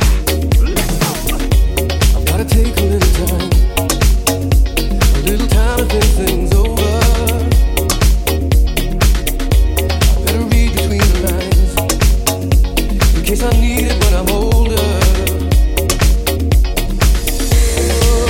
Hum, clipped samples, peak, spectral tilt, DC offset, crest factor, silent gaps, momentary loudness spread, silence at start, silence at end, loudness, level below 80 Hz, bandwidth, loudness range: none; under 0.1%; 0 dBFS; -4.5 dB/octave; under 0.1%; 12 dB; none; 2 LU; 0 s; 0 s; -14 LUFS; -14 dBFS; 17 kHz; 1 LU